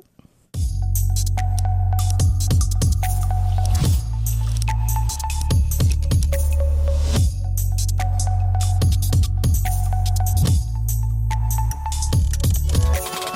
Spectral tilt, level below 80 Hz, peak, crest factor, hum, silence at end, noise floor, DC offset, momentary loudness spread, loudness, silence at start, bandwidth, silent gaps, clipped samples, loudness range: -5 dB/octave; -22 dBFS; -8 dBFS; 10 dB; none; 0 s; -53 dBFS; under 0.1%; 4 LU; -21 LUFS; 0.55 s; 16.5 kHz; none; under 0.1%; 1 LU